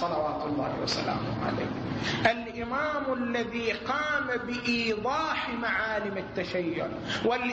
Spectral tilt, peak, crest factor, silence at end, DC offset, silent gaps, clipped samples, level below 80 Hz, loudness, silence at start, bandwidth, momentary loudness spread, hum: -5 dB/octave; -10 dBFS; 20 dB; 0 s; under 0.1%; none; under 0.1%; -54 dBFS; -29 LUFS; 0 s; 8.4 kHz; 5 LU; none